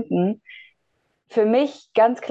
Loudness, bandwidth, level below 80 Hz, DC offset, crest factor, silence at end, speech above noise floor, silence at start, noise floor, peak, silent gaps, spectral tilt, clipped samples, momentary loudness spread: -21 LUFS; 7.8 kHz; -76 dBFS; under 0.1%; 16 dB; 0 s; 51 dB; 0 s; -71 dBFS; -6 dBFS; none; -7.5 dB/octave; under 0.1%; 7 LU